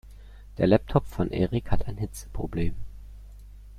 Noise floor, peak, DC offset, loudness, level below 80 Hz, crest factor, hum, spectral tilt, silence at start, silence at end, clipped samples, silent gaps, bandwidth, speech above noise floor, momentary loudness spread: -45 dBFS; -6 dBFS; under 0.1%; -28 LUFS; -38 dBFS; 22 dB; 50 Hz at -40 dBFS; -7.5 dB/octave; 0.05 s; 0 s; under 0.1%; none; 14 kHz; 20 dB; 24 LU